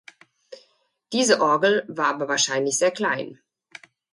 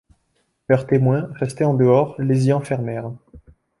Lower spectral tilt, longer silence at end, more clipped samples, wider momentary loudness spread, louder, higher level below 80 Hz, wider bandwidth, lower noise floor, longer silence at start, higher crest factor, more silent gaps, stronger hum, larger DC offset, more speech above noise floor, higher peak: second, -2 dB/octave vs -8.5 dB/octave; first, 0.8 s vs 0.4 s; neither; second, 9 LU vs 15 LU; about the same, -21 LUFS vs -19 LUFS; second, -74 dBFS vs -54 dBFS; about the same, 11.5 kHz vs 11.5 kHz; second, -64 dBFS vs -68 dBFS; second, 0.5 s vs 0.7 s; about the same, 20 dB vs 18 dB; neither; neither; neither; second, 43 dB vs 50 dB; about the same, -4 dBFS vs -2 dBFS